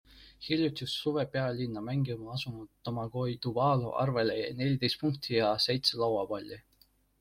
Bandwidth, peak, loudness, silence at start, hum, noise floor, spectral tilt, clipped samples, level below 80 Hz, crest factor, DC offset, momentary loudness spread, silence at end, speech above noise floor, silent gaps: 15.5 kHz; -12 dBFS; -31 LUFS; 0.1 s; none; -67 dBFS; -6 dB/octave; under 0.1%; -62 dBFS; 20 dB; under 0.1%; 11 LU; 0.6 s; 36 dB; none